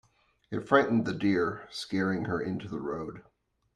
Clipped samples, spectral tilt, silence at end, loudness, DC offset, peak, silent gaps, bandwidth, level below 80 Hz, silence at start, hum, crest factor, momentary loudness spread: under 0.1%; -6.5 dB/octave; 0.55 s; -30 LUFS; under 0.1%; -6 dBFS; none; 12 kHz; -64 dBFS; 0.5 s; none; 24 dB; 14 LU